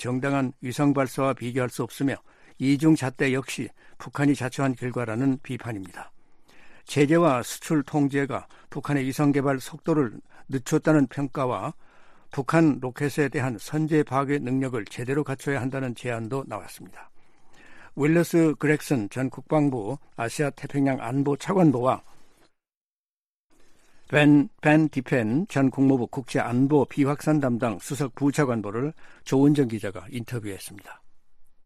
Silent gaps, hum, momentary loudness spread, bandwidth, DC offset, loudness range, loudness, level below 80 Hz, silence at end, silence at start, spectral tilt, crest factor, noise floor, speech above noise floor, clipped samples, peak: 22.77-23.04 s, 23.10-23.50 s; none; 13 LU; 14.5 kHz; under 0.1%; 5 LU; -25 LUFS; -58 dBFS; 0.15 s; 0 s; -6.5 dB/octave; 20 dB; under -90 dBFS; over 66 dB; under 0.1%; -4 dBFS